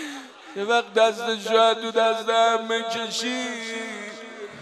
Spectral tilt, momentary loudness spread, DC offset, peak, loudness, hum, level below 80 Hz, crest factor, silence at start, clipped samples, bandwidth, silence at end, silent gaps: -2 dB/octave; 17 LU; under 0.1%; -6 dBFS; -23 LUFS; none; -82 dBFS; 18 dB; 0 s; under 0.1%; 13 kHz; 0 s; none